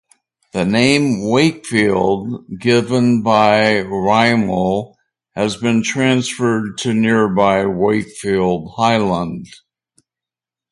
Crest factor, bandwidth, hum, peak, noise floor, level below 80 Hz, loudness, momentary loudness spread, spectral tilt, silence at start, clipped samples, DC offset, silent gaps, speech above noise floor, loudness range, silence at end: 16 dB; 11.5 kHz; none; 0 dBFS; -88 dBFS; -48 dBFS; -16 LUFS; 9 LU; -5.5 dB/octave; 0.55 s; under 0.1%; under 0.1%; none; 73 dB; 3 LU; 1.25 s